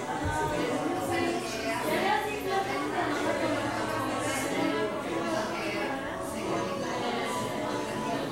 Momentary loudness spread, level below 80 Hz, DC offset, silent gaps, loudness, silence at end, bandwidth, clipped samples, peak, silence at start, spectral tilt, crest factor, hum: 3 LU; -54 dBFS; under 0.1%; none; -30 LUFS; 0 s; 16 kHz; under 0.1%; -16 dBFS; 0 s; -4.5 dB/octave; 16 dB; none